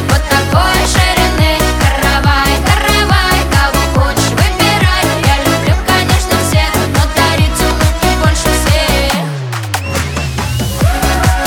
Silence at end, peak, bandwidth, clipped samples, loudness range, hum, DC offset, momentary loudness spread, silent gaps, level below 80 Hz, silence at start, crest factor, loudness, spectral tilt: 0 s; 0 dBFS; 19.5 kHz; under 0.1%; 3 LU; none; under 0.1%; 6 LU; none; -18 dBFS; 0 s; 10 dB; -11 LUFS; -4 dB/octave